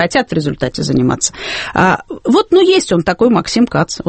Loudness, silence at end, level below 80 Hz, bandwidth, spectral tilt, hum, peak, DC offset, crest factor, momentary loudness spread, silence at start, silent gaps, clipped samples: -13 LUFS; 0 s; -40 dBFS; 8.8 kHz; -4.5 dB/octave; none; 0 dBFS; under 0.1%; 14 dB; 8 LU; 0 s; none; under 0.1%